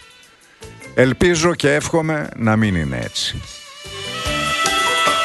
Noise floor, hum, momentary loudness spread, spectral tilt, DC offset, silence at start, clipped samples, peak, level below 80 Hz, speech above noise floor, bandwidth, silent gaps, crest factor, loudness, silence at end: -48 dBFS; none; 15 LU; -4 dB/octave; under 0.1%; 0.6 s; under 0.1%; 0 dBFS; -40 dBFS; 30 dB; 12.5 kHz; none; 18 dB; -18 LUFS; 0 s